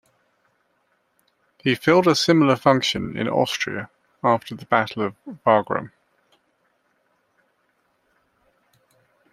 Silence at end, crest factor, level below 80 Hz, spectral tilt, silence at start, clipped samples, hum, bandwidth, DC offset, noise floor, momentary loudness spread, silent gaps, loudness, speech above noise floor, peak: 3.45 s; 22 dB; -60 dBFS; -5 dB/octave; 1.65 s; under 0.1%; none; 15 kHz; under 0.1%; -68 dBFS; 12 LU; none; -21 LUFS; 48 dB; -2 dBFS